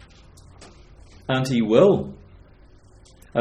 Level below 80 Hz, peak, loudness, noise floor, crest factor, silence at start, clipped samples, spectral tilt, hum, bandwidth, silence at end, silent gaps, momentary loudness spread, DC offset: -50 dBFS; -2 dBFS; -20 LUFS; -50 dBFS; 22 dB; 1.3 s; under 0.1%; -7 dB/octave; none; 13.5 kHz; 0 s; none; 19 LU; under 0.1%